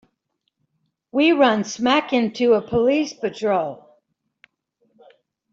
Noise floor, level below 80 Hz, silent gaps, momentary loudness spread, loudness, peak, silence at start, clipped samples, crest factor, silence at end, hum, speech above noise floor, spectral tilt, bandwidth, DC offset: -75 dBFS; -60 dBFS; none; 9 LU; -20 LUFS; -4 dBFS; 1.15 s; under 0.1%; 18 dB; 1.8 s; none; 56 dB; -4.5 dB/octave; 7.8 kHz; under 0.1%